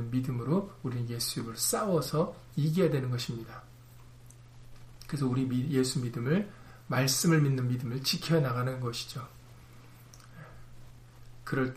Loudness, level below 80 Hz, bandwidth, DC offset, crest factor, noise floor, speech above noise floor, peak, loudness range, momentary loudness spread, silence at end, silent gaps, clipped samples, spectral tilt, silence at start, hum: -30 LUFS; -58 dBFS; 15.5 kHz; under 0.1%; 18 dB; -52 dBFS; 22 dB; -14 dBFS; 5 LU; 20 LU; 0 s; none; under 0.1%; -5 dB/octave; 0 s; none